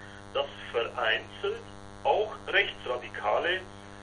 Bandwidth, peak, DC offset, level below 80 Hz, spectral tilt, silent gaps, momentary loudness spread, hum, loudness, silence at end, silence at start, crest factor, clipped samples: 11.5 kHz; -10 dBFS; under 0.1%; -58 dBFS; -4 dB/octave; none; 9 LU; none; -30 LUFS; 0 s; 0 s; 22 dB; under 0.1%